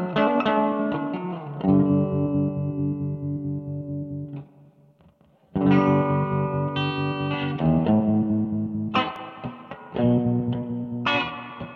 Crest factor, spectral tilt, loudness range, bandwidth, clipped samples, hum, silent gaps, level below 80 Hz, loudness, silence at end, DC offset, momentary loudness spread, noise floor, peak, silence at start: 16 dB; -9 dB/octave; 5 LU; 6.2 kHz; under 0.1%; none; none; -52 dBFS; -24 LUFS; 0 s; under 0.1%; 13 LU; -57 dBFS; -8 dBFS; 0 s